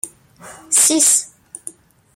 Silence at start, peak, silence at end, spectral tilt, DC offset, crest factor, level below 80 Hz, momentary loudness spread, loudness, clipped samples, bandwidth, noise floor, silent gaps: 0.05 s; -2 dBFS; 0.45 s; 0.5 dB/octave; under 0.1%; 18 dB; -66 dBFS; 23 LU; -12 LUFS; under 0.1%; 16.5 kHz; -39 dBFS; none